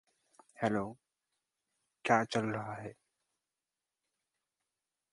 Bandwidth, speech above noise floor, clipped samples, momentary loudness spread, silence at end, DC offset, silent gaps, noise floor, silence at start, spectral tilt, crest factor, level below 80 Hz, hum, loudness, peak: 11.5 kHz; over 56 dB; under 0.1%; 15 LU; 2.2 s; under 0.1%; none; under -90 dBFS; 0.6 s; -5.5 dB/octave; 28 dB; -74 dBFS; none; -35 LUFS; -12 dBFS